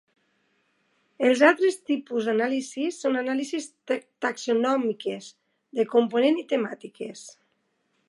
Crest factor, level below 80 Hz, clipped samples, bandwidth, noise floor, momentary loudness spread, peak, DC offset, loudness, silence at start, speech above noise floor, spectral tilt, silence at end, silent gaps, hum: 24 dB; -84 dBFS; under 0.1%; 11.5 kHz; -72 dBFS; 15 LU; -2 dBFS; under 0.1%; -25 LUFS; 1.2 s; 48 dB; -4 dB/octave; 0.8 s; none; none